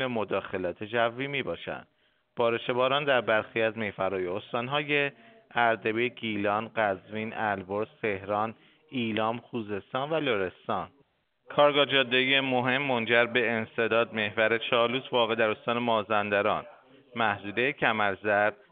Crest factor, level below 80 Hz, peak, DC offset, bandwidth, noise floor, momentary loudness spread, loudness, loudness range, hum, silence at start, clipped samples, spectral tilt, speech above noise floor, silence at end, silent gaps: 20 dB; -70 dBFS; -8 dBFS; under 0.1%; 4.7 kHz; -68 dBFS; 10 LU; -28 LUFS; 6 LU; none; 0 s; under 0.1%; -2 dB/octave; 40 dB; 0.2 s; none